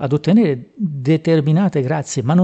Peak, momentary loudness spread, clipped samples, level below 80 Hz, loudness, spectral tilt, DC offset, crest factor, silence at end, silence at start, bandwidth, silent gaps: -4 dBFS; 7 LU; under 0.1%; -58 dBFS; -17 LUFS; -7.5 dB/octave; under 0.1%; 12 dB; 0 s; 0 s; 8.4 kHz; none